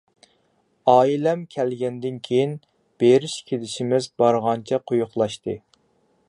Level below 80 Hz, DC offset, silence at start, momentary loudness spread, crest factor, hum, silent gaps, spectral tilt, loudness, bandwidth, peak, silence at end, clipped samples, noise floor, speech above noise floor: -66 dBFS; under 0.1%; 0.85 s; 11 LU; 20 dB; none; none; -6 dB/octave; -22 LUFS; 11.5 kHz; -2 dBFS; 0.7 s; under 0.1%; -65 dBFS; 45 dB